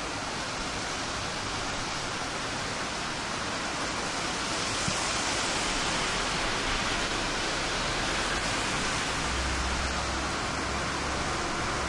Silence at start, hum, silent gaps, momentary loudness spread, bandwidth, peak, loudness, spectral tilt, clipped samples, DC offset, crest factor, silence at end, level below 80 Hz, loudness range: 0 s; none; none; 4 LU; 11.5 kHz; -16 dBFS; -29 LUFS; -2.5 dB/octave; under 0.1%; under 0.1%; 14 dB; 0 s; -42 dBFS; 3 LU